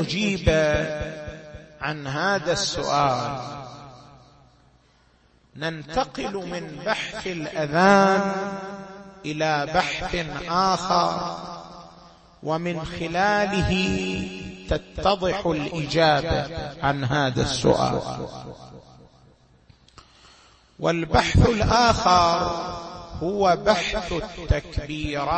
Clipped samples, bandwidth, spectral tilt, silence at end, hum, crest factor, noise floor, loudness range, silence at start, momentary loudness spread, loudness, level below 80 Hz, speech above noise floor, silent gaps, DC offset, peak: under 0.1%; 8.8 kHz; -5 dB/octave; 0 s; none; 18 dB; -59 dBFS; 8 LU; 0 s; 18 LU; -23 LUFS; -38 dBFS; 36 dB; none; under 0.1%; -6 dBFS